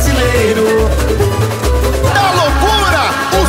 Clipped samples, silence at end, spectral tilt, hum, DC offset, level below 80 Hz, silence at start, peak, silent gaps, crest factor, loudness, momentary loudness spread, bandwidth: under 0.1%; 0 s; -4.5 dB/octave; none; under 0.1%; -18 dBFS; 0 s; 0 dBFS; none; 10 dB; -12 LUFS; 3 LU; 16.5 kHz